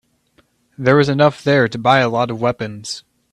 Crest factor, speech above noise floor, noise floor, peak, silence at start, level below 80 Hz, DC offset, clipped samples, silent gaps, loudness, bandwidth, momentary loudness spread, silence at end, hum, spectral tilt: 16 dB; 43 dB; -59 dBFS; 0 dBFS; 0.8 s; -54 dBFS; under 0.1%; under 0.1%; none; -16 LUFS; 11.5 kHz; 13 LU; 0.35 s; none; -6 dB/octave